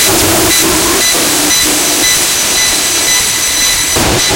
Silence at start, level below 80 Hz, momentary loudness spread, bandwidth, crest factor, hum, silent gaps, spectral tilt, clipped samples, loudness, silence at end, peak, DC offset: 0 s; -30 dBFS; 1 LU; over 20 kHz; 10 dB; none; none; -1 dB/octave; 0.1%; -7 LUFS; 0 s; 0 dBFS; under 0.1%